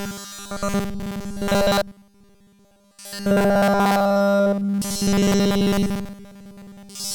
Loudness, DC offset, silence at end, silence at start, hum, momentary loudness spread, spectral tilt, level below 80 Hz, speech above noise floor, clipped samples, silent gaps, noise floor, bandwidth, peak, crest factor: -21 LUFS; under 0.1%; 0 s; 0 s; none; 16 LU; -5 dB/octave; -42 dBFS; 35 dB; under 0.1%; none; -56 dBFS; 19 kHz; -8 dBFS; 14 dB